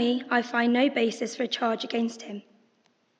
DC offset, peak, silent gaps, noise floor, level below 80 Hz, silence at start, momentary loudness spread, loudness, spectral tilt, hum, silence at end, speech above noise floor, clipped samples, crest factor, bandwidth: under 0.1%; -8 dBFS; none; -68 dBFS; -88 dBFS; 0 s; 14 LU; -26 LUFS; -4 dB/octave; none; 0.8 s; 42 dB; under 0.1%; 18 dB; 8.8 kHz